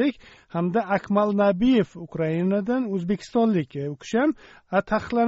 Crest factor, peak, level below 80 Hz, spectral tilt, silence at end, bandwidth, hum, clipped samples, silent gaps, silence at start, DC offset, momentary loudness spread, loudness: 16 dB; -8 dBFS; -52 dBFS; -6 dB/octave; 0 s; 8 kHz; none; under 0.1%; none; 0 s; under 0.1%; 9 LU; -24 LUFS